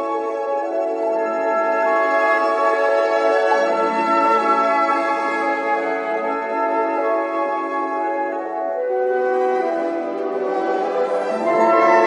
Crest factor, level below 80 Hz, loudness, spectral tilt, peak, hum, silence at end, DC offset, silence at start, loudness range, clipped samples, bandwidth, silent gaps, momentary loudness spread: 16 dB; -86 dBFS; -19 LUFS; -4.5 dB/octave; -4 dBFS; none; 0 s; under 0.1%; 0 s; 4 LU; under 0.1%; 10.5 kHz; none; 7 LU